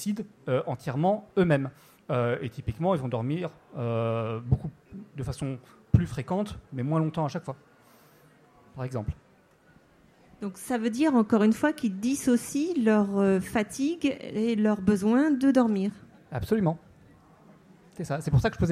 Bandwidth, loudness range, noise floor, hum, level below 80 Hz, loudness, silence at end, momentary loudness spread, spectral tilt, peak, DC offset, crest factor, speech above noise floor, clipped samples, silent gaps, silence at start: 15 kHz; 9 LU; -60 dBFS; none; -48 dBFS; -27 LUFS; 0 s; 15 LU; -7 dB/octave; -6 dBFS; under 0.1%; 22 dB; 33 dB; under 0.1%; none; 0 s